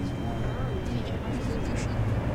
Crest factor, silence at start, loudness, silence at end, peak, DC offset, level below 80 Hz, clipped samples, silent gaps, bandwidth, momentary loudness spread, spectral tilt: 12 dB; 0 s; -31 LUFS; 0 s; -18 dBFS; under 0.1%; -36 dBFS; under 0.1%; none; 13 kHz; 3 LU; -7 dB/octave